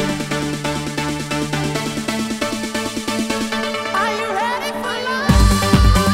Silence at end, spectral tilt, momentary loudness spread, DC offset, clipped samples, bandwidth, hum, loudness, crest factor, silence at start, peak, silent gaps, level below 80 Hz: 0 s; -4.5 dB/octave; 8 LU; under 0.1%; under 0.1%; 16 kHz; none; -19 LUFS; 18 dB; 0 s; 0 dBFS; none; -24 dBFS